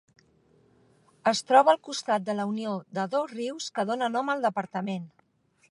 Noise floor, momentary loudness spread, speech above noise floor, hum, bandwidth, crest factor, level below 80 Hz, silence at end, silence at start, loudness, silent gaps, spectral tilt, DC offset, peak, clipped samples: -67 dBFS; 13 LU; 41 dB; none; 11.5 kHz; 22 dB; -80 dBFS; 0.65 s; 1.25 s; -27 LUFS; none; -4.5 dB/octave; under 0.1%; -6 dBFS; under 0.1%